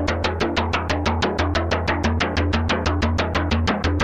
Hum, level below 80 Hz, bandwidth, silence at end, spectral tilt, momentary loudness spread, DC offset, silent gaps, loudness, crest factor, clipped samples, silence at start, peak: none; -30 dBFS; 8.4 kHz; 0 s; -5.5 dB/octave; 1 LU; under 0.1%; none; -21 LUFS; 16 dB; under 0.1%; 0 s; -4 dBFS